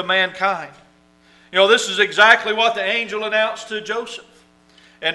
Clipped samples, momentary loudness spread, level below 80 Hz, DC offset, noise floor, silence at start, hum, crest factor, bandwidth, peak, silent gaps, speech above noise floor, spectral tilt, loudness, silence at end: under 0.1%; 16 LU; -64 dBFS; under 0.1%; -53 dBFS; 0 s; none; 20 dB; 11.5 kHz; 0 dBFS; none; 35 dB; -1.5 dB/octave; -17 LUFS; 0 s